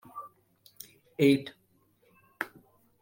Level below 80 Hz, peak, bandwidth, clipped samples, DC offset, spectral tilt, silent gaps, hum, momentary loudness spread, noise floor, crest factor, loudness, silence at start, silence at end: -74 dBFS; -10 dBFS; 16.5 kHz; under 0.1%; under 0.1%; -6 dB/octave; none; none; 24 LU; -68 dBFS; 22 dB; -29 LUFS; 0.15 s; 0.55 s